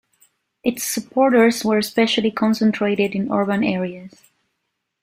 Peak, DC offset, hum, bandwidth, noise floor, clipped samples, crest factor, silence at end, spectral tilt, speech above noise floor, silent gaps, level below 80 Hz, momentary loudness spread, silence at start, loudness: -2 dBFS; under 0.1%; none; 16 kHz; -76 dBFS; under 0.1%; 18 dB; 0.95 s; -4.5 dB/octave; 57 dB; none; -62 dBFS; 10 LU; 0.65 s; -19 LUFS